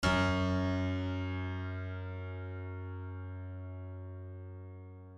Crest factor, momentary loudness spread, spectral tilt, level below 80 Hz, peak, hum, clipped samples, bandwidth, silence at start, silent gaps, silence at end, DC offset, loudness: 20 dB; 16 LU; -6.5 dB/octave; -52 dBFS; -16 dBFS; none; under 0.1%; 10.5 kHz; 0 s; none; 0 s; under 0.1%; -37 LUFS